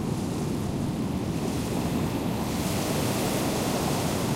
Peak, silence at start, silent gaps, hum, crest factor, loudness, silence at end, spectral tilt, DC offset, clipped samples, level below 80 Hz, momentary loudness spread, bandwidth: -14 dBFS; 0 s; none; none; 14 dB; -28 LUFS; 0 s; -5 dB/octave; under 0.1%; under 0.1%; -44 dBFS; 3 LU; 16 kHz